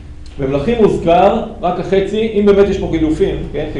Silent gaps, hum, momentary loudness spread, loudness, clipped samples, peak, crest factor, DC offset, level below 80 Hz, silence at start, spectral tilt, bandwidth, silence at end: none; none; 8 LU; -14 LUFS; under 0.1%; 0 dBFS; 12 dB; under 0.1%; -30 dBFS; 0 s; -7.5 dB/octave; 10 kHz; 0 s